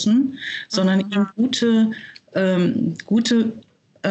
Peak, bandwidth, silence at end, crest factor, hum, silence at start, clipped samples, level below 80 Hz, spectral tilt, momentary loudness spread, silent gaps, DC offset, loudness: -6 dBFS; 8.4 kHz; 0 s; 14 dB; none; 0 s; under 0.1%; -66 dBFS; -5.5 dB/octave; 9 LU; none; under 0.1%; -20 LUFS